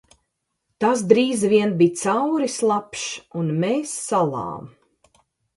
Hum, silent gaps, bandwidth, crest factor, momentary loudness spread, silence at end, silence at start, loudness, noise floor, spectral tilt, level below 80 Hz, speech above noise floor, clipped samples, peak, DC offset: none; none; 11.5 kHz; 22 dB; 12 LU; 0.9 s; 0.8 s; -21 LUFS; -76 dBFS; -5 dB/octave; -64 dBFS; 55 dB; under 0.1%; 0 dBFS; under 0.1%